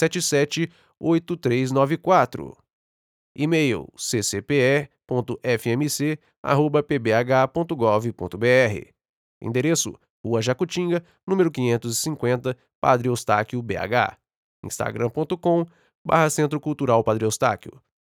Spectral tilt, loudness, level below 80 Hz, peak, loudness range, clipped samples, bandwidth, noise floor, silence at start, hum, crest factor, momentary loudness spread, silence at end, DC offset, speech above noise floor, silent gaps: -5 dB/octave; -22 LUFS; -60 dBFS; -4 dBFS; 2 LU; under 0.1%; 19 kHz; under -90 dBFS; 0 s; none; 20 dB; 9 LU; 0.3 s; under 0.1%; over 68 dB; 2.73-3.35 s, 6.37-6.44 s, 9.09-9.41 s, 10.10-10.24 s, 11.23-11.27 s, 12.75-12.82 s, 14.36-14.63 s, 15.95-16.05 s